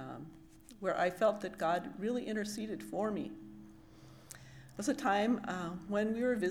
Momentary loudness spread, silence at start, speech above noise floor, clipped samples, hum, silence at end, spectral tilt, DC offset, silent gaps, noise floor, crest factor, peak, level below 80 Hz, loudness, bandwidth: 20 LU; 0 s; 22 dB; under 0.1%; none; 0 s; -5 dB/octave; under 0.1%; none; -56 dBFS; 18 dB; -18 dBFS; -68 dBFS; -36 LUFS; 19 kHz